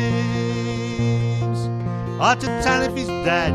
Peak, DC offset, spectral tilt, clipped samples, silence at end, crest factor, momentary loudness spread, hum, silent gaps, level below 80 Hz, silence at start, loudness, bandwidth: -4 dBFS; under 0.1%; -6 dB/octave; under 0.1%; 0 s; 16 dB; 6 LU; none; none; -40 dBFS; 0 s; -21 LUFS; 11.5 kHz